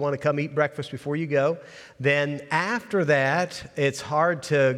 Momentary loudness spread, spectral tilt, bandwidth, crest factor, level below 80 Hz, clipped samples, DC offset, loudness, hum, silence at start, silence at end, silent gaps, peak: 8 LU; -5.5 dB/octave; 13.5 kHz; 16 dB; -66 dBFS; under 0.1%; under 0.1%; -24 LUFS; none; 0 s; 0 s; none; -8 dBFS